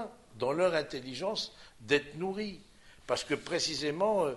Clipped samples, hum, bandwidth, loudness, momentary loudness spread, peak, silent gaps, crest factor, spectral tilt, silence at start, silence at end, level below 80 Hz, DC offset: under 0.1%; none; 11.5 kHz; -33 LUFS; 13 LU; -14 dBFS; none; 18 dB; -3.5 dB/octave; 0 s; 0 s; -64 dBFS; under 0.1%